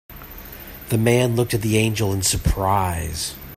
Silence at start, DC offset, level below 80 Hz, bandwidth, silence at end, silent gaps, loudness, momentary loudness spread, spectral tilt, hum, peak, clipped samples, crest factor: 0.1 s; under 0.1%; -34 dBFS; 16 kHz; 0 s; none; -20 LUFS; 18 LU; -4.5 dB/octave; none; -4 dBFS; under 0.1%; 18 dB